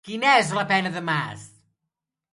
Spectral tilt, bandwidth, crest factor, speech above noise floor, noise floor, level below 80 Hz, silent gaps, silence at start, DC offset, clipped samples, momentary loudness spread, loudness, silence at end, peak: -4 dB/octave; 11.5 kHz; 20 dB; 61 dB; -84 dBFS; -68 dBFS; none; 0.05 s; under 0.1%; under 0.1%; 14 LU; -21 LUFS; 0.85 s; -4 dBFS